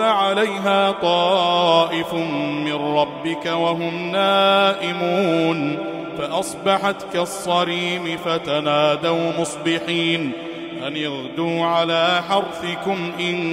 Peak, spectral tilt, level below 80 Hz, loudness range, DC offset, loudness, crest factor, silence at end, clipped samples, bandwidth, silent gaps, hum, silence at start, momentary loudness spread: -2 dBFS; -4.5 dB/octave; -62 dBFS; 3 LU; under 0.1%; -20 LUFS; 18 dB; 0 s; under 0.1%; 16 kHz; none; none; 0 s; 9 LU